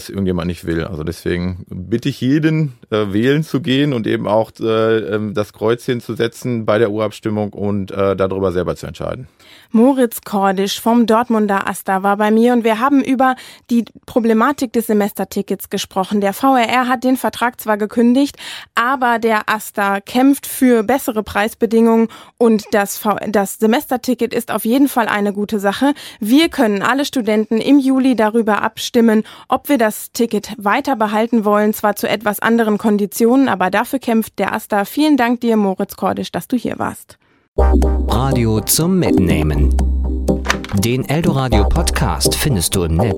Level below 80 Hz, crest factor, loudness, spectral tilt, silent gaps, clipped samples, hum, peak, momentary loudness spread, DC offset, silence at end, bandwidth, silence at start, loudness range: -28 dBFS; 16 dB; -16 LUFS; -5.5 dB/octave; 37.48-37.54 s; under 0.1%; none; 0 dBFS; 8 LU; under 0.1%; 0 s; 17 kHz; 0 s; 3 LU